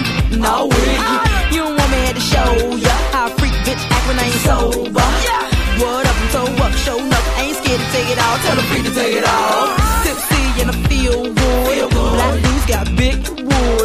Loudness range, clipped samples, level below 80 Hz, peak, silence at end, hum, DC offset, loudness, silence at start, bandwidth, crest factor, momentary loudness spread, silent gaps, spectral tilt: 1 LU; under 0.1%; -20 dBFS; 0 dBFS; 0 s; none; under 0.1%; -15 LUFS; 0 s; 15.5 kHz; 14 dB; 3 LU; none; -4.5 dB/octave